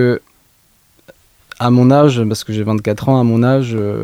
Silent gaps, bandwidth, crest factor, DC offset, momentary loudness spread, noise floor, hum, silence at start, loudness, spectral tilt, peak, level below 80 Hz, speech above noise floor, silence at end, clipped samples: none; 15.5 kHz; 14 dB; under 0.1%; 9 LU; -54 dBFS; none; 0 s; -14 LUFS; -7.5 dB/octave; 0 dBFS; -50 dBFS; 42 dB; 0 s; under 0.1%